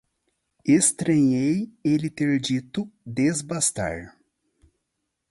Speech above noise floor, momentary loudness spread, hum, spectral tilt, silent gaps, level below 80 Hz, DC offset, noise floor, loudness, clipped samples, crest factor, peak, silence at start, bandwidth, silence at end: 56 dB; 13 LU; none; -4.5 dB/octave; none; -56 dBFS; under 0.1%; -79 dBFS; -23 LUFS; under 0.1%; 18 dB; -6 dBFS; 0.65 s; 11.5 kHz; 1.2 s